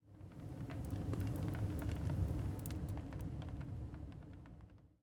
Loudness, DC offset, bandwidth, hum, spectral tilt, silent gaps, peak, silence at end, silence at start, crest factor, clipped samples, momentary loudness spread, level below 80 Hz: -44 LUFS; under 0.1%; over 20 kHz; none; -7.5 dB/octave; none; -26 dBFS; 0.15 s; 0.05 s; 18 dB; under 0.1%; 15 LU; -52 dBFS